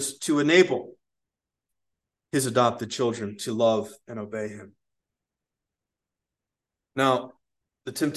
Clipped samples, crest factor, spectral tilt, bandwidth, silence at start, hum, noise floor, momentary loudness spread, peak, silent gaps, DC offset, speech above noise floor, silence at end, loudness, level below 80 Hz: under 0.1%; 24 dB; -4.5 dB/octave; 12.5 kHz; 0 s; none; -88 dBFS; 18 LU; -4 dBFS; none; under 0.1%; 63 dB; 0 s; -25 LUFS; -70 dBFS